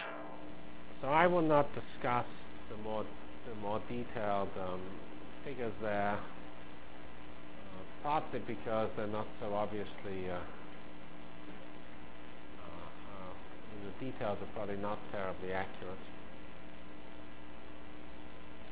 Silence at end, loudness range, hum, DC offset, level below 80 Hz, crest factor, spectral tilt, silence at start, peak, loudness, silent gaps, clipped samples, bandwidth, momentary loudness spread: 0 s; 13 LU; none; 1%; -60 dBFS; 26 dB; -4.5 dB/octave; 0 s; -14 dBFS; -38 LUFS; none; under 0.1%; 4 kHz; 16 LU